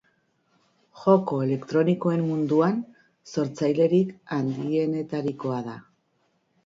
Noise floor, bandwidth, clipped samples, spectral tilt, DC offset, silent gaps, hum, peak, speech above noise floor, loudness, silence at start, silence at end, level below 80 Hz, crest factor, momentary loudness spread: -70 dBFS; 7.6 kHz; under 0.1%; -8 dB/octave; under 0.1%; none; none; -6 dBFS; 46 dB; -25 LUFS; 0.95 s; 0.85 s; -70 dBFS; 20 dB; 11 LU